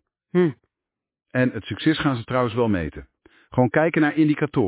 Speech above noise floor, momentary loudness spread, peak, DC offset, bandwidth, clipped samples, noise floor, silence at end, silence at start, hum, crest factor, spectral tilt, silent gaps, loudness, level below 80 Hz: 66 dB; 7 LU; -4 dBFS; under 0.1%; 4 kHz; under 0.1%; -87 dBFS; 0 s; 0.35 s; none; 18 dB; -11 dB/octave; none; -22 LUFS; -48 dBFS